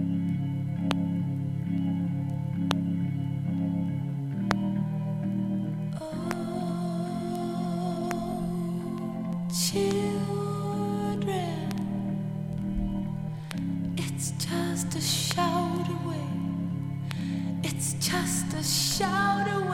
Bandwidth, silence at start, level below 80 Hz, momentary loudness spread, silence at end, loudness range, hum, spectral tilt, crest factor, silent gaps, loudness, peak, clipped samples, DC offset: 16.5 kHz; 0 s; -50 dBFS; 7 LU; 0 s; 2 LU; none; -5 dB/octave; 26 dB; none; -30 LUFS; -2 dBFS; under 0.1%; under 0.1%